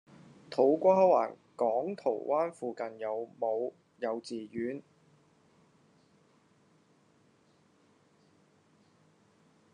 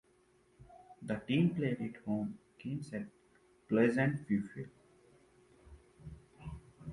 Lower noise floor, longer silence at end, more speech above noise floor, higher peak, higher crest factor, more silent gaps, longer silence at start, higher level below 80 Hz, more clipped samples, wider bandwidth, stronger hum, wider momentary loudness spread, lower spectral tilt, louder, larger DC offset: about the same, -67 dBFS vs -69 dBFS; first, 4.95 s vs 0 s; about the same, 37 dB vs 35 dB; first, -12 dBFS vs -16 dBFS; about the same, 22 dB vs 22 dB; neither; about the same, 0.5 s vs 0.6 s; second, -86 dBFS vs -64 dBFS; neither; second, 10 kHz vs 11.5 kHz; neither; second, 14 LU vs 22 LU; about the same, -7 dB/octave vs -8 dB/octave; first, -31 LUFS vs -35 LUFS; neither